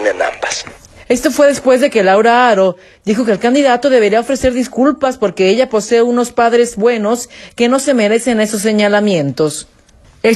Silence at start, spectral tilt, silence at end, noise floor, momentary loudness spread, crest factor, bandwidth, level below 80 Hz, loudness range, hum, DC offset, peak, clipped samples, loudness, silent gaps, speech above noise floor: 0 s; -4.5 dB/octave; 0 s; -45 dBFS; 8 LU; 12 dB; 13 kHz; -44 dBFS; 2 LU; none; under 0.1%; 0 dBFS; under 0.1%; -12 LUFS; none; 33 dB